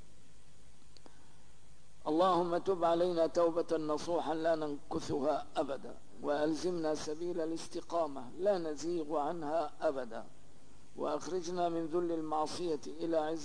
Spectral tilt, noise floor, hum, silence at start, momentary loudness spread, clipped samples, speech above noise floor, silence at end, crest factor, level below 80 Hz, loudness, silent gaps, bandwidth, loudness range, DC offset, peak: -5.5 dB/octave; -63 dBFS; 50 Hz at -70 dBFS; 2.05 s; 9 LU; under 0.1%; 28 dB; 0 s; 16 dB; -66 dBFS; -35 LUFS; none; 10.5 kHz; 5 LU; 0.7%; -20 dBFS